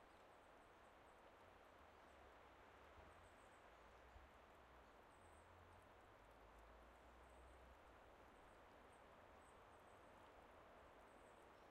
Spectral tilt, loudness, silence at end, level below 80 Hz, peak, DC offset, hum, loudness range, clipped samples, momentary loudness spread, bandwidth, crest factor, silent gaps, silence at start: -4.5 dB/octave; -67 LUFS; 0 s; -76 dBFS; -54 dBFS; under 0.1%; none; 1 LU; under 0.1%; 2 LU; 13 kHz; 14 dB; none; 0 s